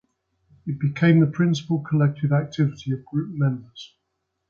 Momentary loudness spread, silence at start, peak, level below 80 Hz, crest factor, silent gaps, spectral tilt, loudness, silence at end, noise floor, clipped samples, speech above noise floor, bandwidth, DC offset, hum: 16 LU; 0.65 s; -6 dBFS; -60 dBFS; 16 dB; none; -8 dB/octave; -22 LUFS; 0.65 s; -77 dBFS; under 0.1%; 55 dB; 7 kHz; under 0.1%; none